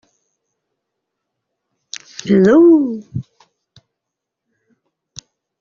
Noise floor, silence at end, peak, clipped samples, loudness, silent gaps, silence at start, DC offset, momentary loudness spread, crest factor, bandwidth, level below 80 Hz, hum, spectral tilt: -81 dBFS; 2.4 s; -2 dBFS; under 0.1%; -12 LUFS; none; 2.25 s; under 0.1%; 23 LU; 16 dB; 7.4 kHz; -58 dBFS; none; -7 dB/octave